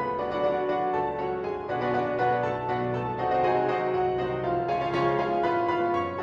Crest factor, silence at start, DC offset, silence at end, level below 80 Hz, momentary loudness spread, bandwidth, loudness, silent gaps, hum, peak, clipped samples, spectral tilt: 14 dB; 0 s; under 0.1%; 0 s; -54 dBFS; 4 LU; 7 kHz; -27 LUFS; none; none; -12 dBFS; under 0.1%; -7.5 dB/octave